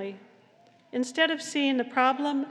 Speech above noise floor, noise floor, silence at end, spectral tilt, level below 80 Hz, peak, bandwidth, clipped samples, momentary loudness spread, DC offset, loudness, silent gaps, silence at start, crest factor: 32 dB; -59 dBFS; 0 s; -2.5 dB/octave; under -90 dBFS; -8 dBFS; 11.5 kHz; under 0.1%; 10 LU; under 0.1%; -26 LUFS; none; 0 s; 20 dB